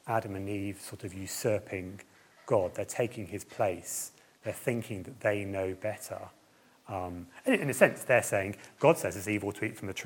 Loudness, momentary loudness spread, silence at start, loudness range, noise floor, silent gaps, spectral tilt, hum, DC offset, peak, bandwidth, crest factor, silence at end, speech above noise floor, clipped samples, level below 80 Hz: -32 LUFS; 15 LU; 0.05 s; 7 LU; -63 dBFS; none; -5 dB/octave; none; under 0.1%; -6 dBFS; 17.5 kHz; 26 dB; 0 s; 31 dB; under 0.1%; -72 dBFS